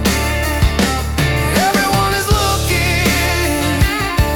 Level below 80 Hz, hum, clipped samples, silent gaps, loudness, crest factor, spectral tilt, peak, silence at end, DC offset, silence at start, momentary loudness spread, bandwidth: -22 dBFS; none; under 0.1%; none; -15 LUFS; 14 dB; -4 dB/octave; -2 dBFS; 0 s; under 0.1%; 0 s; 3 LU; 18 kHz